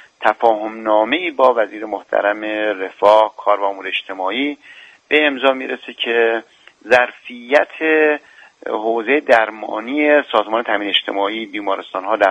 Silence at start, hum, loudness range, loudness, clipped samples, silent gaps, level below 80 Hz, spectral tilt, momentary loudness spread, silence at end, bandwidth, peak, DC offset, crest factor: 0.2 s; none; 2 LU; -17 LUFS; under 0.1%; none; -64 dBFS; -4 dB/octave; 9 LU; 0 s; 9 kHz; 0 dBFS; under 0.1%; 18 dB